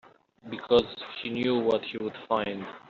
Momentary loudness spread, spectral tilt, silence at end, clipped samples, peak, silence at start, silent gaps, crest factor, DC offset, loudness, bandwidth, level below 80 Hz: 12 LU; -3 dB/octave; 0.1 s; under 0.1%; -10 dBFS; 0.45 s; none; 20 dB; under 0.1%; -28 LUFS; 7.2 kHz; -64 dBFS